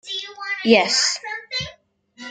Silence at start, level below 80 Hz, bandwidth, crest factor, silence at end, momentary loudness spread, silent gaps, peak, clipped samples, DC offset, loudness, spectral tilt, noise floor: 0.05 s; -60 dBFS; 9.6 kHz; 22 dB; 0 s; 15 LU; none; 0 dBFS; under 0.1%; under 0.1%; -20 LUFS; -2 dB/octave; -52 dBFS